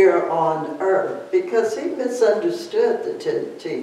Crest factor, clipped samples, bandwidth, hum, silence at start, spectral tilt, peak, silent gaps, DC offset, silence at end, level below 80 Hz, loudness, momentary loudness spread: 16 dB; under 0.1%; 12.5 kHz; none; 0 s; -5.5 dB/octave; -4 dBFS; none; under 0.1%; 0 s; -78 dBFS; -21 LUFS; 6 LU